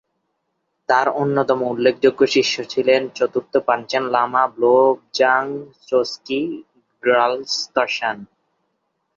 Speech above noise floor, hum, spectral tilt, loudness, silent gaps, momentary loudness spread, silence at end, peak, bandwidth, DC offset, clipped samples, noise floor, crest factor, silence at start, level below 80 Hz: 55 dB; none; -4 dB/octave; -19 LUFS; none; 8 LU; 0.95 s; -2 dBFS; 7.6 kHz; under 0.1%; under 0.1%; -73 dBFS; 18 dB; 0.9 s; -66 dBFS